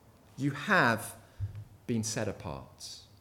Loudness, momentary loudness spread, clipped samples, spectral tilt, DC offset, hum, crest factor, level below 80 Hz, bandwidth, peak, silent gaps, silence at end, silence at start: -32 LUFS; 19 LU; under 0.1%; -4.5 dB/octave; under 0.1%; none; 22 dB; -58 dBFS; 17.5 kHz; -12 dBFS; none; 0.15 s; 0.35 s